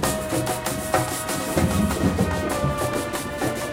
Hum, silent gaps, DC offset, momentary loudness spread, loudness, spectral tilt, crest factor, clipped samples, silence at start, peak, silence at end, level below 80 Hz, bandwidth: none; none; under 0.1%; 4 LU; -24 LUFS; -4.5 dB/octave; 18 dB; under 0.1%; 0 s; -6 dBFS; 0 s; -38 dBFS; 17 kHz